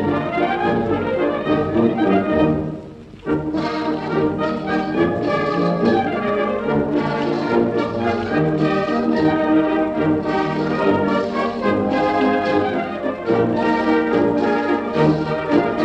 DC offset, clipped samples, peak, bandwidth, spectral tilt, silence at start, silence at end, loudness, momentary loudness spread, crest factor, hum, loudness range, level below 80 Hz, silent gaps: under 0.1%; under 0.1%; -4 dBFS; 8.2 kHz; -8 dB/octave; 0 s; 0 s; -19 LUFS; 5 LU; 16 dB; none; 2 LU; -46 dBFS; none